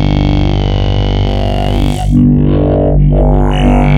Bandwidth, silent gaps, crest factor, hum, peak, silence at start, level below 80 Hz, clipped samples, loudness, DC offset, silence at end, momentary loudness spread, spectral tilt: 9.8 kHz; none; 8 dB; 50 Hz at -25 dBFS; 0 dBFS; 0 s; -14 dBFS; under 0.1%; -11 LUFS; under 0.1%; 0 s; 4 LU; -8 dB/octave